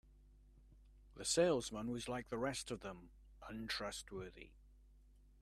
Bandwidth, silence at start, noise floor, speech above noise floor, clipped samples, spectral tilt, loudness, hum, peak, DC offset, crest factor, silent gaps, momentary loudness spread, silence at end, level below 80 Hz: 14.5 kHz; 0.05 s; -66 dBFS; 24 dB; under 0.1%; -3.5 dB/octave; -42 LUFS; none; -22 dBFS; under 0.1%; 22 dB; none; 23 LU; 0.15 s; -64 dBFS